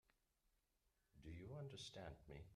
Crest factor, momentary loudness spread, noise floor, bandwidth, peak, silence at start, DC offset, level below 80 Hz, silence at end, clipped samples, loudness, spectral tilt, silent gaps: 18 dB; 6 LU; -86 dBFS; 13 kHz; -42 dBFS; 1.15 s; under 0.1%; -72 dBFS; 0 s; under 0.1%; -57 LUFS; -5 dB/octave; none